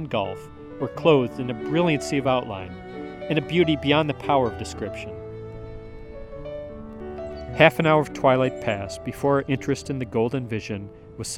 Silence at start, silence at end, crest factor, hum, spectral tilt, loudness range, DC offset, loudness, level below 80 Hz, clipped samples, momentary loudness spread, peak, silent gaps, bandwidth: 0 s; 0 s; 24 dB; none; -6 dB/octave; 5 LU; under 0.1%; -23 LUFS; -48 dBFS; under 0.1%; 18 LU; 0 dBFS; none; 16 kHz